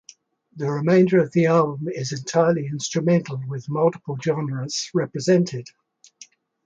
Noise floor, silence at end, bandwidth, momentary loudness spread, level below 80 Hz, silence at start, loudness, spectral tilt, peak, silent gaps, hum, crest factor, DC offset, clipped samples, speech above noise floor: -52 dBFS; 0.4 s; 9 kHz; 10 LU; -66 dBFS; 0.55 s; -22 LUFS; -6 dB/octave; -6 dBFS; none; none; 16 dB; under 0.1%; under 0.1%; 31 dB